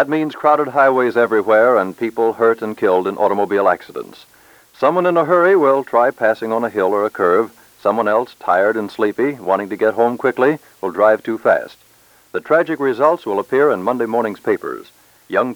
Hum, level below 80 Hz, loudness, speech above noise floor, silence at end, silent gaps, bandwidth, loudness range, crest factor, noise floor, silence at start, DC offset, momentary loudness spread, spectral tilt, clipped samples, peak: none; -66 dBFS; -16 LUFS; 35 dB; 0 s; none; over 20 kHz; 3 LU; 16 dB; -51 dBFS; 0 s; under 0.1%; 8 LU; -6.5 dB/octave; under 0.1%; -2 dBFS